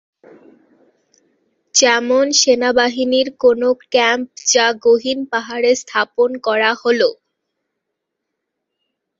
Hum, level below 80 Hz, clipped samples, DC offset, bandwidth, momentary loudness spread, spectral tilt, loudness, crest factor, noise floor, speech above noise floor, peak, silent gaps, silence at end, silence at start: none; -64 dBFS; under 0.1%; under 0.1%; 7.8 kHz; 6 LU; -0.5 dB/octave; -15 LUFS; 18 dB; -77 dBFS; 62 dB; 0 dBFS; none; 2.05 s; 1.75 s